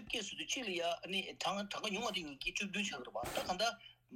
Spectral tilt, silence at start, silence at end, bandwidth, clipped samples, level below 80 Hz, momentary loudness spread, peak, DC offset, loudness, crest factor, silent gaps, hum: -2.5 dB/octave; 0 s; 0 s; 16.5 kHz; under 0.1%; -66 dBFS; 4 LU; -24 dBFS; under 0.1%; -39 LUFS; 18 dB; none; none